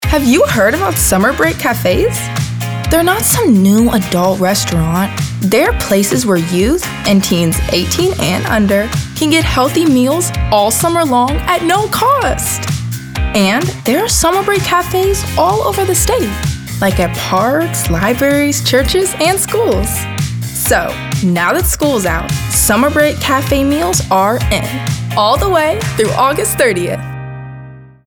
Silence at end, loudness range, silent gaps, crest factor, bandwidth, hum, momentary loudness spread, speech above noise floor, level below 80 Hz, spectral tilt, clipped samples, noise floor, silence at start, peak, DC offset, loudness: 0.2 s; 2 LU; none; 12 dB; over 20 kHz; none; 7 LU; 21 dB; -26 dBFS; -4.5 dB/octave; under 0.1%; -33 dBFS; 0 s; 0 dBFS; under 0.1%; -12 LUFS